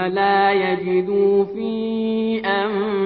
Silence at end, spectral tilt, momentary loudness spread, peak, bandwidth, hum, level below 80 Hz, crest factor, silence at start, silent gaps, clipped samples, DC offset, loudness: 0 s; -10 dB/octave; 6 LU; -4 dBFS; 5 kHz; none; -60 dBFS; 14 dB; 0 s; none; under 0.1%; under 0.1%; -19 LUFS